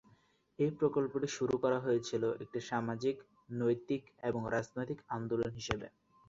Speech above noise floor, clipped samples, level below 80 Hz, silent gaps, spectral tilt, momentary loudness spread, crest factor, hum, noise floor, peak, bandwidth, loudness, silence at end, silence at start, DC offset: 33 dB; under 0.1%; -64 dBFS; none; -6 dB/octave; 8 LU; 24 dB; none; -69 dBFS; -12 dBFS; 7.8 kHz; -36 LUFS; 0.4 s; 0.6 s; under 0.1%